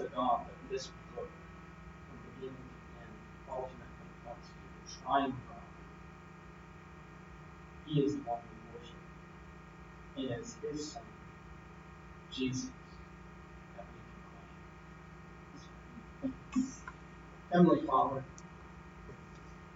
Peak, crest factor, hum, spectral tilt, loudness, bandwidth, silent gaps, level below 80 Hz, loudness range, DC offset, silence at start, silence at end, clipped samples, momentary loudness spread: -14 dBFS; 26 dB; 60 Hz at -75 dBFS; -6.5 dB/octave; -36 LUFS; 8 kHz; none; -58 dBFS; 14 LU; under 0.1%; 0 s; 0 s; under 0.1%; 20 LU